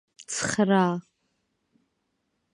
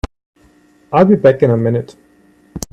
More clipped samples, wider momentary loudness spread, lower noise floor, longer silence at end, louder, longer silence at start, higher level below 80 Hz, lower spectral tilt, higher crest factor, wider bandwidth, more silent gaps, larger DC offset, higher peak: neither; second, 12 LU vs 22 LU; first, -76 dBFS vs -50 dBFS; first, 1.55 s vs 0.15 s; second, -25 LUFS vs -13 LUFS; first, 0.2 s vs 0.05 s; second, -66 dBFS vs -38 dBFS; second, -4.5 dB/octave vs -7.5 dB/octave; about the same, 20 dB vs 16 dB; second, 11 kHz vs 15 kHz; second, none vs 0.26-0.33 s; neither; second, -8 dBFS vs 0 dBFS